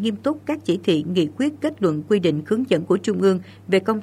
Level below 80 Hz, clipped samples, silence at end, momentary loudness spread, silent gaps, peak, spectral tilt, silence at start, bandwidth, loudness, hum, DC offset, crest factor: -66 dBFS; under 0.1%; 0 s; 4 LU; none; -4 dBFS; -6.5 dB/octave; 0 s; 13 kHz; -21 LUFS; none; under 0.1%; 16 dB